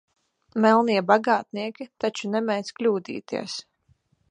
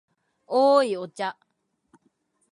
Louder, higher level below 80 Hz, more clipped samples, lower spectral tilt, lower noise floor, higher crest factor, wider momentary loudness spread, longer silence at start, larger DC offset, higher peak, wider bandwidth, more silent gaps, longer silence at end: about the same, -24 LUFS vs -23 LUFS; first, -74 dBFS vs -86 dBFS; neither; about the same, -5 dB/octave vs -4.5 dB/octave; second, -65 dBFS vs -70 dBFS; about the same, 22 dB vs 20 dB; about the same, 14 LU vs 13 LU; about the same, 0.55 s vs 0.5 s; neither; first, -2 dBFS vs -8 dBFS; about the same, 10 kHz vs 11 kHz; neither; second, 0.7 s vs 1.2 s